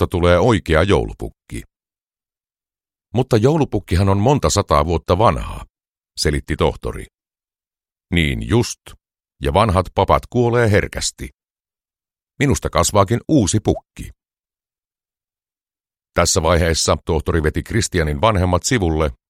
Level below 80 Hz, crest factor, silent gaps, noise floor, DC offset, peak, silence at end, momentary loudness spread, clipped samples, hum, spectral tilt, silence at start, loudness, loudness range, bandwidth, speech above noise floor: -32 dBFS; 18 dB; 5.89-5.93 s, 7.92-7.96 s, 11.34-11.38 s, 14.40-14.44 s; under -90 dBFS; under 0.1%; 0 dBFS; 0.15 s; 16 LU; under 0.1%; none; -5 dB/octave; 0 s; -17 LUFS; 5 LU; 15.5 kHz; over 73 dB